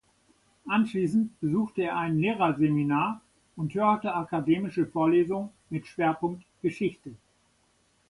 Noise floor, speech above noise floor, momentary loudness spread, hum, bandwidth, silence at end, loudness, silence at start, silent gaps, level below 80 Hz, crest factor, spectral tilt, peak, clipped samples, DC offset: -68 dBFS; 41 dB; 11 LU; none; 11.5 kHz; 0.95 s; -28 LUFS; 0.65 s; none; -64 dBFS; 18 dB; -8 dB/octave; -10 dBFS; under 0.1%; under 0.1%